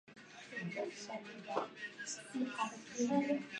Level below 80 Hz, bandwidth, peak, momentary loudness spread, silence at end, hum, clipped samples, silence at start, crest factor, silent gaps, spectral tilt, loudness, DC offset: -86 dBFS; 11 kHz; -20 dBFS; 12 LU; 0 s; none; under 0.1%; 0.05 s; 20 dB; none; -4 dB/octave; -41 LUFS; under 0.1%